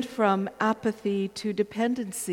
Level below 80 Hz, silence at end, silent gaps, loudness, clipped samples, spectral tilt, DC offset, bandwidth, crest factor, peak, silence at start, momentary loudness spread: -66 dBFS; 0 s; none; -27 LUFS; under 0.1%; -5 dB/octave; under 0.1%; 17 kHz; 18 dB; -10 dBFS; 0 s; 5 LU